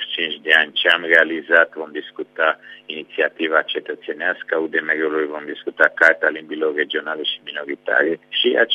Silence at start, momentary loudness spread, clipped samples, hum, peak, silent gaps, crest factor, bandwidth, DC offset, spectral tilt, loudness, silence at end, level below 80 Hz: 0 s; 15 LU; under 0.1%; none; 0 dBFS; none; 20 dB; 12 kHz; under 0.1%; -3.5 dB/octave; -18 LUFS; 0 s; -76 dBFS